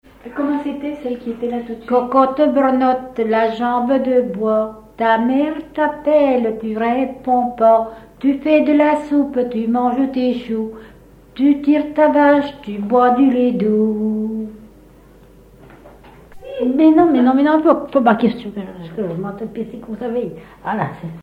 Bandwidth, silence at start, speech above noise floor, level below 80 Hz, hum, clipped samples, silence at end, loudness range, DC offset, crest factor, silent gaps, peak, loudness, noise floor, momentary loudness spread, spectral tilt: 8 kHz; 0.25 s; 29 dB; -50 dBFS; none; under 0.1%; 0 s; 4 LU; under 0.1%; 16 dB; none; 0 dBFS; -17 LUFS; -45 dBFS; 14 LU; -8 dB/octave